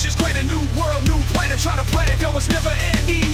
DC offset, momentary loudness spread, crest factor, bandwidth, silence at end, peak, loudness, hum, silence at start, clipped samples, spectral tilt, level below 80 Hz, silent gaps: under 0.1%; 2 LU; 12 dB; 16 kHz; 0 s; -6 dBFS; -19 LUFS; none; 0 s; under 0.1%; -4.5 dB/octave; -22 dBFS; none